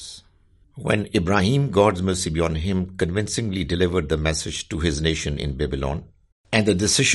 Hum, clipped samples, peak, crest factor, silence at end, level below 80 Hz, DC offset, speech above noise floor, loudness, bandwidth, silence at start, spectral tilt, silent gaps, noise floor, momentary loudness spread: none; under 0.1%; -4 dBFS; 20 dB; 0 s; -38 dBFS; under 0.1%; 35 dB; -22 LUFS; 11.5 kHz; 0 s; -4.5 dB/octave; 6.32-6.44 s; -56 dBFS; 8 LU